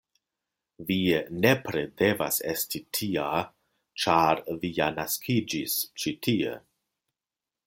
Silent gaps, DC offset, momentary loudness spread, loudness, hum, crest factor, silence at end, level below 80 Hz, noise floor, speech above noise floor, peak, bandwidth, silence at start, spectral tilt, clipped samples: none; under 0.1%; 8 LU; -27 LUFS; none; 22 dB; 1.1 s; -62 dBFS; under -90 dBFS; over 63 dB; -6 dBFS; 17 kHz; 0.8 s; -4 dB/octave; under 0.1%